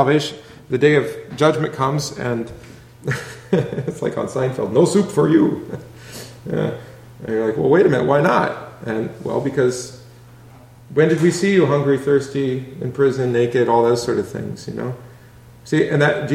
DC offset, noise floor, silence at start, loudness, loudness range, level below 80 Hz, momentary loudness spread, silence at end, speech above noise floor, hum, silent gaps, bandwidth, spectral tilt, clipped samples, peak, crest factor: under 0.1%; -43 dBFS; 0 s; -19 LUFS; 3 LU; -54 dBFS; 14 LU; 0 s; 26 dB; none; none; 15.5 kHz; -6 dB/octave; under 0.1%; -2 dBFS; 18 dB